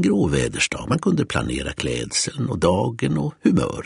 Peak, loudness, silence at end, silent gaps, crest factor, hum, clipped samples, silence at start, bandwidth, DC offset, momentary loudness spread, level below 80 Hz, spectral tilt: -4 dBFS; -22 LUFS; 0 s; none; 18 dB; none; under 0.1%; 0 s; 11 kHz; under 0.1%; 5 LU; -40 dBFS; -5 dB/octave